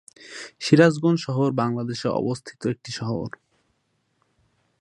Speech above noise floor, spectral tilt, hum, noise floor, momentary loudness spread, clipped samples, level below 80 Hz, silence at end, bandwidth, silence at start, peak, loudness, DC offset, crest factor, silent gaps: 49 dB; -6.5 dB/octave; none; -71 dBFS; 18 LU; under 0.1%; -62 dBFS; 1.5 s; 11 kHz; 0.2 s; -2 dBFS; -23 LUFS; under 0.1%; 22 dB; none